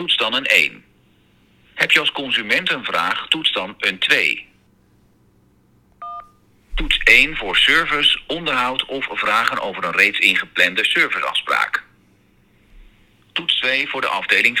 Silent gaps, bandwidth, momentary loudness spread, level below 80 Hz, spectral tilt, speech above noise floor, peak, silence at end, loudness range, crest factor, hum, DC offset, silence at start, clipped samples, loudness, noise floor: none; over 20 kHz; 11 LU; -40 dBFS; -2 dB/octave; 38 dB; 0 dBFS; 0 s; 5 LU; 20 dB; none; under 0.1%; 0 s; under 0.1%; -16 LUFS; -56 dBFS